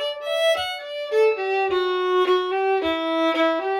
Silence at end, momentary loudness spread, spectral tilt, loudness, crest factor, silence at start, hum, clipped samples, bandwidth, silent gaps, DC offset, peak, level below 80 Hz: 0 s; 5 LU; -3 dB/octave; -22 LUFS; 10 dB; 0 s; none; under 0.1%; 16.5 kHz; none; under 0.1%; -10 dBFS; -60 dBFS